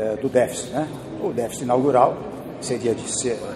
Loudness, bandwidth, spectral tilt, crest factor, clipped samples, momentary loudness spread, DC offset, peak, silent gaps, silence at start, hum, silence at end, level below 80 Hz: -23 LUFS; 15 kHz; -5 dB/octave; 20 dB; under 0.1%; 12 LU; under 0.1%; -2 dBFS; none; 0 s; none; 0 s; -54 dBFS